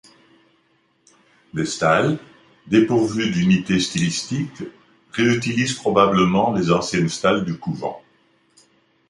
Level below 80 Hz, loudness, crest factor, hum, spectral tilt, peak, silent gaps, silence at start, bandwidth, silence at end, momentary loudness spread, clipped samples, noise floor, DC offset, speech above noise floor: -52 dBFS; -20 LUFS; 18 dB; none; -5 dB/octave; -2 dBFS; none; 1.55 s; 11.5 kHz; 1.1 s; 13 LU; under 0.1%; -63 dBFS; under 0.1%; 44 dB